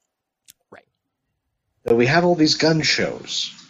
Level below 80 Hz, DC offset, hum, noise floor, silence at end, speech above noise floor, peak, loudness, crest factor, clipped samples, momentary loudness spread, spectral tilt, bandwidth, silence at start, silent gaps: -54 dBFS; under 0.1%; none; -77 dBFS; 0.15 s; 58 dB; -4 dBFS; -18 LUFS; 18 dB; under 0.1%; 9 LU; -4.5 dB/octave; 14.5 kHz; 0.7 s; none